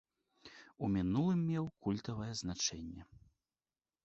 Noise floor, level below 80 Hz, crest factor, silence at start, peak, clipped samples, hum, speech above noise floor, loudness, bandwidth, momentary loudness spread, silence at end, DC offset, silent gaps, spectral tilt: under -90 dBFS; -60 dBFS; 18 dB; 0.45 s; -22 dBFS; under 0.1%; none; over 53 dB; -37 LUFS; 8 kHz; 21 LU; 0.85 s; under 0.1%; none; -6.5 dB/octave